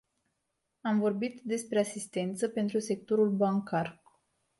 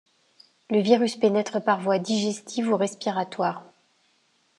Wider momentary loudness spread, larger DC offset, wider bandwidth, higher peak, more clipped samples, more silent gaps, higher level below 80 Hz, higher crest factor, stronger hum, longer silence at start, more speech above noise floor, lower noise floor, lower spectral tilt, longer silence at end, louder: about the same, 7 LU vs 8 LU; neither; about the same, 12 kHz vs 11.5 kHz; second, -16 dBFS vs -6 dBFS; neither; neither; first, -76 dBFS vs -86 dBFS; about the same, 16 dB vs 20 dB; neither; first, 0.85 s vs 0.7 s; first, 52 dB vs 43 dB; first, -82 dBFS vs -66 dBFS; about the same, -6 dB/octave vs -5 dB/octave; second, 0.65 s vs 0.95 s; second, -31 LUFS vs -24 LUFS